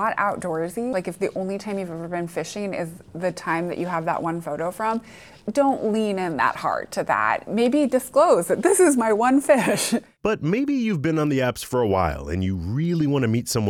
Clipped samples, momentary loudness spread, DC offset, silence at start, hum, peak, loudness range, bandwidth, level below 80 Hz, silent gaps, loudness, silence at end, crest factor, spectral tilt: under 0.1%; 11 LU; under 0.1%; 0 s; none; -6 dBFS; 8 LU; 18 kHz; -48 dBFS; none; -23 LUFS; 0 s; 16 dB; -5.5 dB/octave